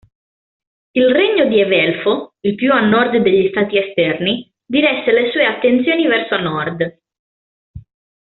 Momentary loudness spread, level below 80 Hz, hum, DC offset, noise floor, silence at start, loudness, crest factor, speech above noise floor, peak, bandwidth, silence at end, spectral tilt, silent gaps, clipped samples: 8 LU; -54 dBFS; none; under 0.1%; under -90 dBFS; 0.95 s; -15 LUFS; 14 dB; over 76 dB; -2 dBFS; 4.3 kHz; 0.45 s; -3 dB/octave; 7.19-7.74 s; under 0.1%